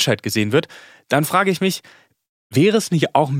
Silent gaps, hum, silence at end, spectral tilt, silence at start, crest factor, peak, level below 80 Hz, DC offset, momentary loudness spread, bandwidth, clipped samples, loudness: 2.29-2.50 s; none; 0 s; -5 dB/octave; 0 s; 18 dB; -2 dBFS; -66 dBFS; under 0.1%; 7 LU; 17 kHz; under 0.1%; -18 LUFS